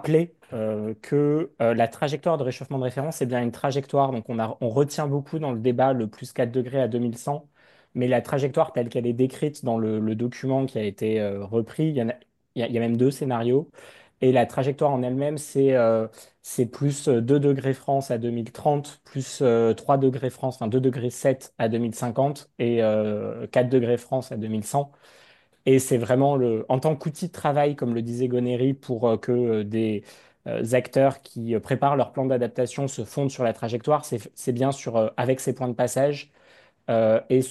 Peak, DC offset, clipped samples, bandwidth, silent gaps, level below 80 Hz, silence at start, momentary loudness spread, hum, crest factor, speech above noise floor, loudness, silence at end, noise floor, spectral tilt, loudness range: -6 dBFS; under 0.1%; under 0.1%; 12.5 kHz; none; -66 dBFS; 0 s; 8 LU; none; 18 dB; 32 dB; -24 LUFS; 0 s; -56 dBFS; -7 dB/octave; 2 LU